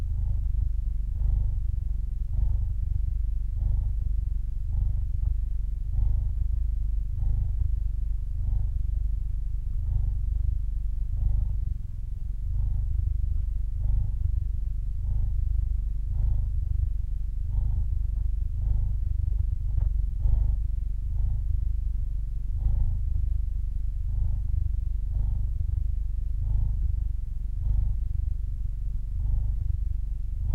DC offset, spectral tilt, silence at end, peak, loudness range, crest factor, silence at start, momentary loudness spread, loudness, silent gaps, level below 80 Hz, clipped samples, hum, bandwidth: under 0.1%; -9.5 dB/octave; 0 s; -12 dBFS; 2 LU; 14 dB; 0 s; 4 LU; -31 LUFS; none; -26 dBFS; under 0.1%; none; 1 kHz